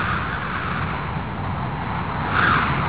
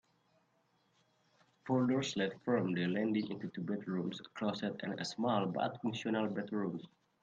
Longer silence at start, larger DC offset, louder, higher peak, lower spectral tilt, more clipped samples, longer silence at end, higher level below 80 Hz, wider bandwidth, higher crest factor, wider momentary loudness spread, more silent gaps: second, 0 s vs 1.65 s; first, 0.8% vs under 0.1%; first, -23 LUFS vs -37 LUFS; first, -6 dBFS vs -20 dBFS; first, -9.5 dB/octave vs -6 dB/octave; neither; second, 0 s vs 0.35 s; first, -36 dBFS vs -78 dBFS; second, 4 kHz vs 9 kHz; about the same, 16 dB vs 18 dB; about the same, 9 LU vs 8 LU; neither